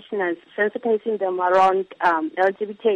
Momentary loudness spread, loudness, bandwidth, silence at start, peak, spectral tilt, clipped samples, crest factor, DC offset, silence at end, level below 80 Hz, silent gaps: 8 LU; -21 LUFS; 9 kHz; 0.1 s; -8 dBFS; -6 dB/octave; under 0.1%; 14 dB; under 0.1%; 0 s; -70 dBFS; none